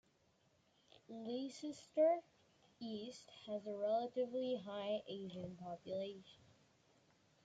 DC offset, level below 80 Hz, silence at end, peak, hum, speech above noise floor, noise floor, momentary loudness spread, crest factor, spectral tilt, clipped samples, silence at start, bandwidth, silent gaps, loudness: under 0.1%; -84 dBFS; 1.1 s; -26 dBFS; none; 34 dB; -76 dBFS; 16 LU; 20 dB; -5.5 dB/octave; under 0.1%; 1.1 s; 9.2 kHz; none; -43 LUFS